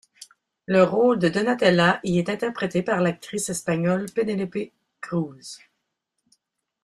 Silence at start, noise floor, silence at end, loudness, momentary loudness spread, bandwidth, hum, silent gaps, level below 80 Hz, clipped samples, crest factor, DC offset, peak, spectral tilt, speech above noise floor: 0.2 s; -79 dBFS; 1.3 s; -23 LUFS; 19 LU; 13.5 kHz; none; none; -62 dBFS; under 0.1%; 20 dB; under 0.1%; -4 dBFS; -5.5 dB/octave; 56 dB